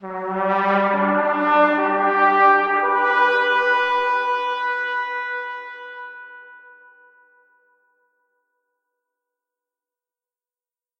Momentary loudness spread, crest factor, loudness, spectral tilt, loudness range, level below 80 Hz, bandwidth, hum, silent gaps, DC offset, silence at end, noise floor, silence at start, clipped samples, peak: 19 LU; 20 dB; -18 LUFS; -6 dB/octave; 16 LU; -72 dBFS; 7.8 kHz; none; none; under 0.1%; 4.4 s; under -90 dBFS; 0 s; under 0.1%; -2 dBFS